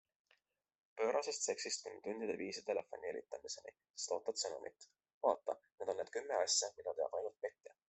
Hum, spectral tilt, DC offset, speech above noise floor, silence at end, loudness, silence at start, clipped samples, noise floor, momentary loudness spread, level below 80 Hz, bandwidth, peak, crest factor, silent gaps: none; -1 dB/octave; under 0.1%; 36 dB; 0.2 s; -41 LUFS; 0.95 s; under 0.1%; -79 dBFS; 12 LU; -88 dBFS; 8.4 kHz; -20 dBFS; 22 dB; 3.90-3.94 s, 5.14-5.21 s